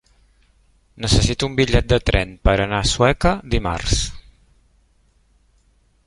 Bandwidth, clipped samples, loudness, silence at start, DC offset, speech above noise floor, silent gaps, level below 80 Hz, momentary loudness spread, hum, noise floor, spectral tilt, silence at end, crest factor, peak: 11.5 kHz; under 0.1%; -19 LUFS; 0.95 s; under 0.1%; 41 dB; none; -28 dBFS; 6 LU; none; -59 dBFS; -4.5 dB/octave; 1.85 s; 20 dB; -2 dBFS